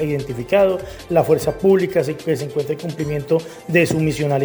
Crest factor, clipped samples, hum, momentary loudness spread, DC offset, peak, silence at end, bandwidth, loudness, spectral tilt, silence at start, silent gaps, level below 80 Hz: 18 dB; under 0.1%; none; 8 LU; under 0.1%; -2 dBFS; 0 s; over 20 kHz; -19 LUFS; -6.5 dB/octave; 0 s; none; -46 dBFS